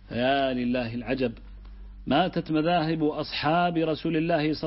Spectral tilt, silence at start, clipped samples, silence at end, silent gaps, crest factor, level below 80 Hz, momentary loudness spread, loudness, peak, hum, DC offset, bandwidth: -10 dB/octave; 0 s; under 0.1%; 0 s; none; 16 dB; -48 dBFS; 6 LU; -26 LUFS; -10 dBFS; none; under 0.1%; 5.8 kHz